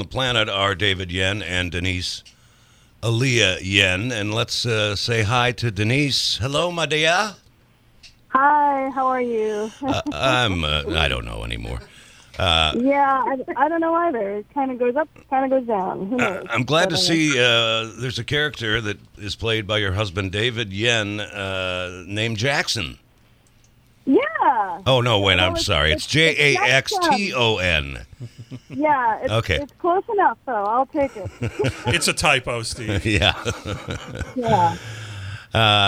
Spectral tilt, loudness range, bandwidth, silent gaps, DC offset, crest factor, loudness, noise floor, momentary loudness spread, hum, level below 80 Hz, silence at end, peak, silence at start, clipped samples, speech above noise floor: -4 dB/octave; 5 LU; 15.5 kHz; none; under 0.1%; 20 dB; -20 LUFS; -55 dBFS; 12 LU; none; -40 dBFS; 0 s; 0 dBFS; 0 s; under 0.1%; 34 dB